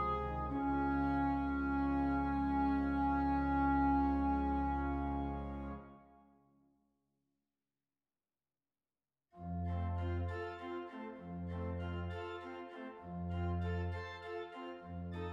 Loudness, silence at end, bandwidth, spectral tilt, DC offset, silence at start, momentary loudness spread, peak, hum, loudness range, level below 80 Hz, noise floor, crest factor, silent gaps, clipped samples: -38 LUFS; 0 s; 5.6 kHz; -9.5 dB/octave; under 0.1%; 0 s; 14 LU; -22 dBFS; none; 13 LU; -48 dBFS; under -90 dBFS; 16 dB; none; under 0.1%